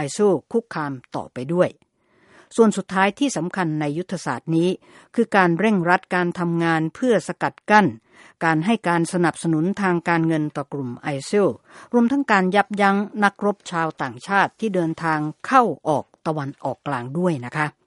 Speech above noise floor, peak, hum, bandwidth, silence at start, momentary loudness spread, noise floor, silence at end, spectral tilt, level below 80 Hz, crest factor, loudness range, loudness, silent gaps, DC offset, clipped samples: 36 dB; 0 dBFS; none; 11.5 kHz; 0 s; 10 LU; -57 dBFS; 0.15 s; -6 dB/octave; -66 dBFS; 20 dB; 2 LU; -21 LUFS; none; under 0.1%; under 0.1%